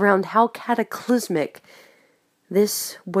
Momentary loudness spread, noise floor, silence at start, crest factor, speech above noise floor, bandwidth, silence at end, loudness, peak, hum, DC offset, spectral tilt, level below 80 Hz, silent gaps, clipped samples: 7 LU; -62 dBFS; 0 s; 20 dB; 41 dB; 15.5 kHz; 0 s; -22 LUFS; -2 dBFS; none; under 0.1%; -4.5 dB/octave; -76 dBFS; none; under 0.1%